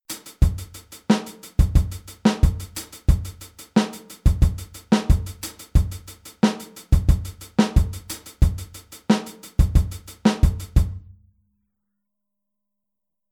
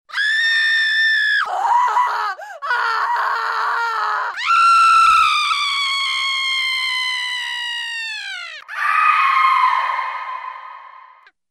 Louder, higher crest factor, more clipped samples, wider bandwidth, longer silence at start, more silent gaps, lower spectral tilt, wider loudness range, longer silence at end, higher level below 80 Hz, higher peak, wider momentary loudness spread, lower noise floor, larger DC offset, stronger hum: second, -23 LUFS vs -16 LUFS; about the same, 18 dB vs 14 dB; neither; first, 19 kHz vs 15 kHz; about the same, 0.1 s vs 0.1 s; neither; first, -6.5 dB/octave vs 3 dB/octave; about the same, 2 LU vs 4 LU; first, 2.35 s vs 0.5 s; first, -24 dBFS vs -62 dBFS; about the same, -4 dBFS vs -4 dBFS; about the same, 15 LU vs 14 LU; first, -85 dBFS vs -47 dBFS; neither; neither